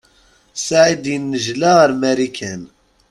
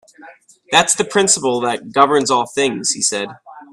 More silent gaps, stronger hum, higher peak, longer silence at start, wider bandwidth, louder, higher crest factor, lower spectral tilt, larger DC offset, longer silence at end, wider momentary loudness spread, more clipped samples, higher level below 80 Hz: neither; neither; about the same, 0 dBFS vs 0 dBFS; first, 0.55 s vs 0.2 s; second, 12 kHz vs 13.5 kHz; about the same, -16 LUFS vs -15 LUFS; about the same, 16 dB vs 18 dB; first, -4 dB/octave vs -2 dB/octave; neither; first, 0.45 s vs 0.1 s; first, 16 LU vs 6 LU; neither; about the same, -56 dBFS vs -60 dBFS